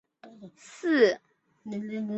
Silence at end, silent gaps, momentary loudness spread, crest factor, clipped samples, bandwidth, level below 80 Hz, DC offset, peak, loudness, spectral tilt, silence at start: 0 s; none; 23 LU; 20 dB; under 0.1%; 8.2 kHz; -76 dBFS; under 0.1%; -8 dBFS; -27 LUFS; -5.5 dB/octave; 0.25 s